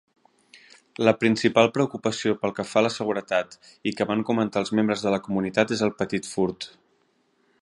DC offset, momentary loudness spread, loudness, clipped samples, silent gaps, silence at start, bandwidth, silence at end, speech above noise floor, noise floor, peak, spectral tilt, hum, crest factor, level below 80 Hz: under 0.1%; 8 LU; -24 LUFS; under 0.1%; none; 1 s; 11.5 kHz; 0.95 s; 43 dB; -67 dBFS; -2 dBFS; -5 dB/octave; none; 22 dB; -62 dBFS